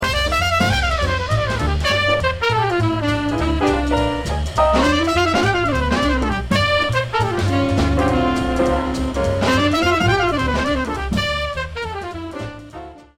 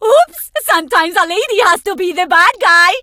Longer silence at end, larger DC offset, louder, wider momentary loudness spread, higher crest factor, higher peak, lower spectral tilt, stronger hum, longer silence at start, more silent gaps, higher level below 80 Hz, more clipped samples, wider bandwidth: first, 0.15 s vs 0 s; neither; second, -18 LUFS vs -11 LUFS; about the same, 8 LU vs 9 LU; about the same, 16 dB vs 12 dB; second, -4 dBFS vs 0 dBFS; first, -5.5 dB/octave vs 0 dB/octave; neither; about the same, 0 s vs 0 s; neither; first, -28 dBFS vs -54 dBFS; neither; about the same, 16 kHz vs 16.5 kHz